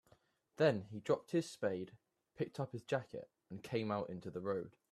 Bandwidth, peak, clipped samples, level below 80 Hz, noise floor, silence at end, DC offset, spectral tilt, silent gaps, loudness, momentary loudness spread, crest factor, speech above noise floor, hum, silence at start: 13.5 kHz; -20 dBFS; under 0.1%; -78 dBFS; -73 dBFS; 0.2 s; under 0.1%; -6.5 dB/octave; none; -40 LUFS; 17 LU; 20 dB; 33 dB; none; 0.6 s